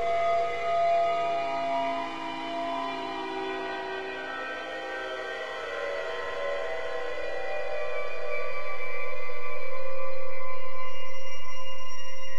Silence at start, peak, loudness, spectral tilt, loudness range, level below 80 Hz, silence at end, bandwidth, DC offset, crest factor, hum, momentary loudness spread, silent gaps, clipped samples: 0 s; -12 dBFS; -32 LUFS; -4.5 dB/octave; 7 LU; -60 dBFS; 0 s; 11 kHz; under 0.1%; 8 dB; none; 12 LU; none; under 0.1%